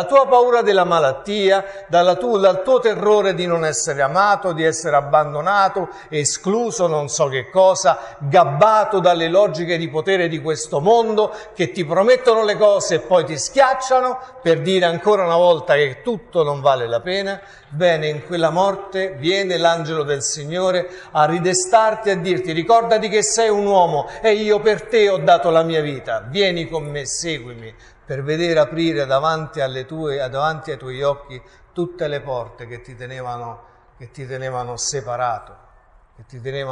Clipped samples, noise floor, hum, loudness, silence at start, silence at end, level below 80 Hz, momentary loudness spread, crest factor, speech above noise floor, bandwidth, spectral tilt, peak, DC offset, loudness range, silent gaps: under 0.1%; -51 dBFS; none; -18 LUFS; 0 s; 0 s; -52 dBFS; 12 LU; 16 dB; 33 dB; 11.5 kHz; -4 dB/octave; 0 dBFS; under 0.1%; 9 LU; none